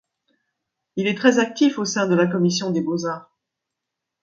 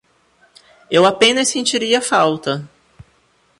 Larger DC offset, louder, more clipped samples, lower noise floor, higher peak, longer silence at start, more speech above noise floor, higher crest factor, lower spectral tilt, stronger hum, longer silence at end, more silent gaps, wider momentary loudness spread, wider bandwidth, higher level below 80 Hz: neither; second, -20 LUFS vs -15 LUFS; neither; first, -83 dBFS vs -58 dBFS; about the same, -2 dBFS vs 0 dBFS; about the same, 0.95 s vs 0.9 s; first, 63 dB vs 43 dB; about the same, 20 dB vs 18 dB; first, -5 dB/octave vs -2.5 dB/octave; neither; about the same, 1 s vs 0.95 s; neither; about the same, 10 LU vs 11 LU; second, 7.8 kHz vs 11.5 kHz; second, -68 dBFS vs -60 dBFS